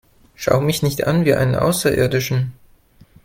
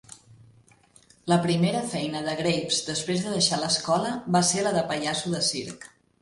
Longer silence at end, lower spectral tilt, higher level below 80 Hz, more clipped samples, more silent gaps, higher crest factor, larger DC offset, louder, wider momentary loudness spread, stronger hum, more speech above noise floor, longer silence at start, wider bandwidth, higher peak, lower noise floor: first, 0.7 s vs 0.35 s; first, -5.5 dB/octave vs -4 dB/octave; first, -44 dBFS vs -62 dBFS; neither; neither; about the same, 18 dB vs 18 dB; neither; first, -18 LUFS vs -25 LUFS; about the same, 6 LU vs 7 LU; neither; about the same, 33 dB vs 32 dB; first, 0.4 s vs 0.1 s; first, 17 kHz vs 11.5 kHz; first, 0 dBFS vs -8 dBFS; second, -50 dBFS vs -58 dBFS